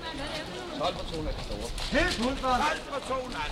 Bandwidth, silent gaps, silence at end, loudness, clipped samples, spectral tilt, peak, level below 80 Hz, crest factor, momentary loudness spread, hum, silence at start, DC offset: 16 kHz; none; 0 s; -30 LUFS; under 0.1%; -4 dB/octave; -14 dBFS; -40 dBFS; 16 dB; 9 LU; none; 0 s; under 0.1%